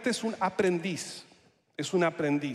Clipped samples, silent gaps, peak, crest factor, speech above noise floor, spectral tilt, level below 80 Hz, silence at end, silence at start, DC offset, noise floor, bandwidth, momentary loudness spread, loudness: under 0.1%; none; -14 dBFS; 16 dB; 33 dB; -5 dB/octave; -74 dBFS; 0 s; 0 s; under 0.1%; -62 dBFS; 14 kHz; 13 LU; -30 LUFS